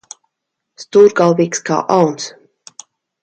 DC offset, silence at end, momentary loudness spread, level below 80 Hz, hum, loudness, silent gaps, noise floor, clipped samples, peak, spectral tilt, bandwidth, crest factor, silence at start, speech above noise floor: under 0.1%; 0.95 s; 11 LU; -62 dBFS; none; -13 LUFS; none; -76 dBFS; under 0.1%; 0 dBFS; -5 dB/octave; 8.8 kHz; 16 dB; 0.8 s; 64 dB